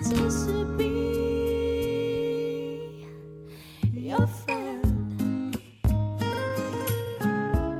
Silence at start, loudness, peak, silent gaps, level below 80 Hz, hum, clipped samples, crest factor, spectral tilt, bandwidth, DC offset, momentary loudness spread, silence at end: 0 s; -28 LUFS; -10 dBFS; none; -38 dBFS; none; under 0.1%; 16 dB; -6.5 dB/octave; 15.5 kHz; under 0.1%; 11 LU; 0 s